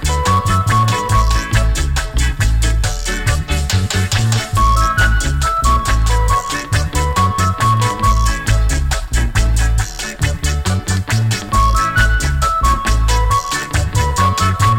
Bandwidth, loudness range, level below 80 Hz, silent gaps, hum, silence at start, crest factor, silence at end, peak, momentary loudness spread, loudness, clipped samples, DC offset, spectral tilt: 16.5 kHz; 2 LU; -18 dBFS; none; none; 0 s; 12 dB; 0 s; -2 dBFS; 5 LU; -15 LUFS; under 0.1%; under 0.1%; -4 dB/octave